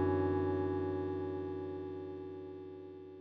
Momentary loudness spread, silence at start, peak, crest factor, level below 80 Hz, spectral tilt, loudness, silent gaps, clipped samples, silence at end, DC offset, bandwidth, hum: 15 LU; 0 s; -22 dBFS; 16 dB; -78 dBFS; -8 dB/octave; -38 LUFS; none; under 0.1%; 0 s; under 0.1%; 4.9 kHz; 60 Hz at -75 dBFS